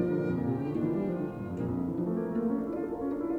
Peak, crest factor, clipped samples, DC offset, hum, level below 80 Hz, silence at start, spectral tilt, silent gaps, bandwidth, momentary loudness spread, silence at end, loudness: -18 dBFS; 14 dB; under 0.1%; under 0.1%; none; -58 dBFS; 0 s; -10.5 dB/octave; none; 7.6 kHz; 4 LU; 0 s; -32 LUFS